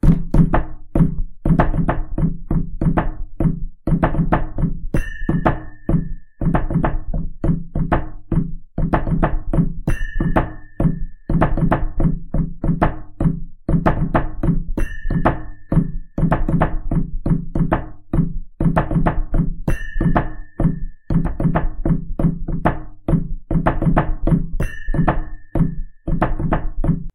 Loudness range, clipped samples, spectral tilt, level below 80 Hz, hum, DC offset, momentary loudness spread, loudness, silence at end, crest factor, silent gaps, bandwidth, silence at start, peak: 1 LU; under 0.1%; -9.5 dB/octave; -22 dBFS; none; under 0.1%; 7 LU; -21 LUFS; 0.05 s; 18 dB; none; 10 kHz; 0.05 s; 0 dBFS